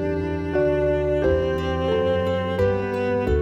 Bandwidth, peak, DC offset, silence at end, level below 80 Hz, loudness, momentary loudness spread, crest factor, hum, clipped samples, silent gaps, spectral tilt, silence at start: 8.4 kHz; -10 dBFS; under 0.1%; 0 s; -34 dBFS; -22 LUFS; 3 LU; 12 dB; none; under 0.1%; none; -8 dB/octave; 0 s